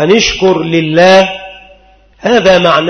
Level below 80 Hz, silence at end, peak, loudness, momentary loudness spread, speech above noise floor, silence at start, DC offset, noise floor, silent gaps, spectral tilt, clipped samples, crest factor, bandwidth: -38 dBFS; 0 s; 0 dBFS; -8 LUFS; 10 LU; 36 dB; 0 s; under 0.1%; -43 dBFS; none; -4.5 dB/octave; 0.4%; 10 dB; 11 kHz